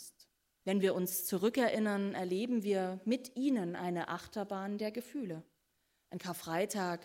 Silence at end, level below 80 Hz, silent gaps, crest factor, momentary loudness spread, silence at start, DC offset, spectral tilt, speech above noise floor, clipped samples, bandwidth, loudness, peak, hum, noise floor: 0 s; -78 dBFS; none; 16 dB; 11 LU; 0 s; under 0.1%; -5 dB/octave; 44 dB; under 0.1%; 16 kHz; -36 LUFS; -20 dBFS; none; -79 dBFS